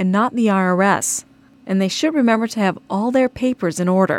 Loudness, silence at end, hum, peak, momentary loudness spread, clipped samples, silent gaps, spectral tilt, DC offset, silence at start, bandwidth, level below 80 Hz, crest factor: -18 LUFS; 0 s; none; -4 dBFS; 5 LU; under 0.1%; none; -5 dB/octave; under 0.1%; 0 s; 16 kHz; -56 dBFS; 14 dB